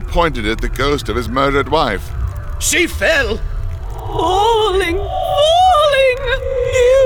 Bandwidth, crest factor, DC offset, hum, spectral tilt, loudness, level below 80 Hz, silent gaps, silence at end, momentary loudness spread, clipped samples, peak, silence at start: 19 kHz; 14 dB; 0.4%; none; -4 dB/octave; -15 LUFS; -24 dBFS; none; 0 s; 13 LU; under 0.1%; -2 dBFS; 0 s